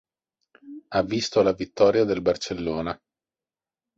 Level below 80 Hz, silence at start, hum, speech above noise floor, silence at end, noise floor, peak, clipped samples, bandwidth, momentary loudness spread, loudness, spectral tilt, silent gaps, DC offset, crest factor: -54 dBFS; 0.65 s; none; over 67 dB; 1.05 s; under -90 dBFS; -6 dBFS; under 0.1%; 8 kHz; 16 LU; -24 LUFS; -5 dB/octave; none; under 0.1%; 20 dB